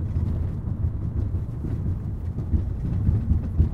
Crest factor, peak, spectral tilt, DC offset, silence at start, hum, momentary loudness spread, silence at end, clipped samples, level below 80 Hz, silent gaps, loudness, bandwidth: 16 dB; -8 dBFS; -11 dB/octave; under 0.1%; 0 s; none; 6 LU; 0 s; under 0.1%; -28 dBFS; none; -27 LUFS; 2.8 kHz